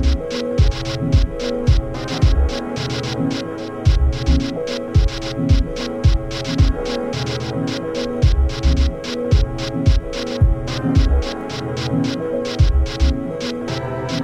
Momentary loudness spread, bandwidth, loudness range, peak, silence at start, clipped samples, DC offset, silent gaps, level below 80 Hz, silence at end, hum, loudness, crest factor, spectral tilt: 6 LU; 9.6 kHz; 1 LU; -2 dBFS; 0 s; under 0.1%; under 0.1%; none; -20 dBFS; 0 s; none; -20 LUFS; 14 dB; -6.5 dB/octave